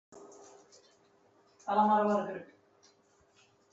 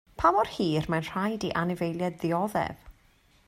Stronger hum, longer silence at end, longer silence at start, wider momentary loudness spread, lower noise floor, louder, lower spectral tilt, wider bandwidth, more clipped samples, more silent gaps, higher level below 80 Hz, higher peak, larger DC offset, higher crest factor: neither; first, 1.3 s vs 0.55 s; about the same, 0.1 s vs 0.2 s; first, 27 LU vs 7 LU; first, -67 dBFS vs -62 dBFS; about the same, -30 LUFS vs -28 LUFS; about the same, -6.5 dB/octave vs -6.5 dB/octave; second, 8 kHz vs 16 kHz; neither; neither; second, -80 dBFS vs -52 dBFS; second, -16 dBFS vs -8 dBFS; neither; about the same, 20 dB vs 20 dB